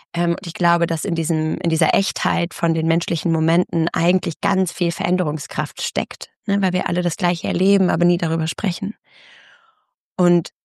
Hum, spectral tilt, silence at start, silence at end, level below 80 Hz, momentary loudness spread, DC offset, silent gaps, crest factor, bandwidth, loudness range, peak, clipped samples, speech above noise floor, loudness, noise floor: none; -5.5 dB/octave; 0.15 s; 0.15 s; -60 dBFS; 6 LU; under 0.1%; 4.36-4.40 s, 6.36-6.43 s, 9.94-10.16 s; 18 dB; 12.5 kHz; 2 LU; -2 dBFS; under 0.1%; 45 dB; -20 LUFS; -64 dBFS